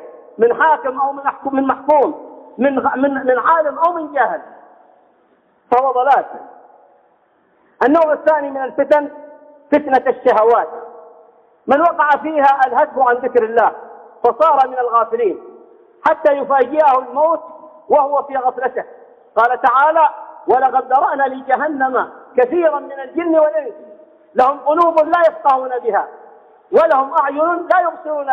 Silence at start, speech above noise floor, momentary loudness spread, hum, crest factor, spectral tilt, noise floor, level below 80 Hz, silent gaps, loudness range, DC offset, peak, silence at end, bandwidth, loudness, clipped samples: 0 s; 42 dB; 9 LU; none; 14 dB; -6.5 dB/octave; -56 dBFS; -64 dBFS; none; 3 LU; under 0.1%; -2 dBFS; 0 s; 6.4 kHz; -15 LUFS; under 0.1%